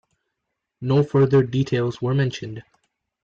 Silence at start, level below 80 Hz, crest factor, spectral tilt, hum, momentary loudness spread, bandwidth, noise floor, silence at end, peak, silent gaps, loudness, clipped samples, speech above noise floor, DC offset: 0.8 s; -56 dBFS; 14 dB; -8 dB/octave; none; 16 LU; 7.2 kHz; -80 dBFS; 0.6 s; -8 dBFS; none; -21 LUFS; under 0.1%; 60 dB; under 0.1%